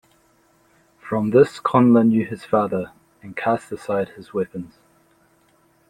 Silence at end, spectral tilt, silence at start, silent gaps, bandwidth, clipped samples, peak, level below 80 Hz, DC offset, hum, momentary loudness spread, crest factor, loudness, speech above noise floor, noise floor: 1.25 s; -8 dB/octave; 1.05 s; none; 10.5 kHz; under 0.1%; -2 dBFS; -62 dBFS; under 0.1%; none; 16 LU; 20 dB; -20 LUFS; 40 dB; -59 dBFS